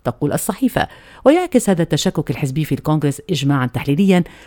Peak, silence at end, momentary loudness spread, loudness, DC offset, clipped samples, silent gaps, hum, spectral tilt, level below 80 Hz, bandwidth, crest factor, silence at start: 0 dBFS; 0.2 s; 6 LU; -17 LUFS; under 0.1%; under 0.1%; none; none; -6 dB/octave; -44 dBFS; 19 kHz; 16 dB; 0.05 s